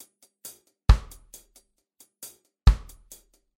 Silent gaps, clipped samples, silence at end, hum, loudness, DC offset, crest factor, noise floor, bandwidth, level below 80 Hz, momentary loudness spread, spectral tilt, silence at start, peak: none; under 0.1%; 0.8 s; none; -25 LUFS; under 0.1%; 22 dB; -62 dBFS; 16.5 kHz; -28 dBFS; 25 LU; -5.5 dB/octave; 0.9 s; -4 dBFS